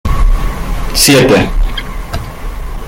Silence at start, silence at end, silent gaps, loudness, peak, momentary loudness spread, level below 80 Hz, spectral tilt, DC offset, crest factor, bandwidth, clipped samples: 0.05 s; 0 s; none; -11 LUFS; 0 dBFS; 18 LU; -14 dBFS; -4 dB/octave; under 0.1%; 12 dB; 17 kHz; under 0.1%